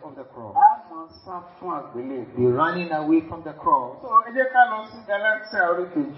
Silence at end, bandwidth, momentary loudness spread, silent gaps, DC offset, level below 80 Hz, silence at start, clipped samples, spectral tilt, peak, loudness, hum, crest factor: 0 s; 5.8 kHz; 19 LU; none; under 0.1%; -64 dBFS; 0 s; under 0.1%; -10 dB/octave; -4 dBFS; -22 LUFS; none; 18 dB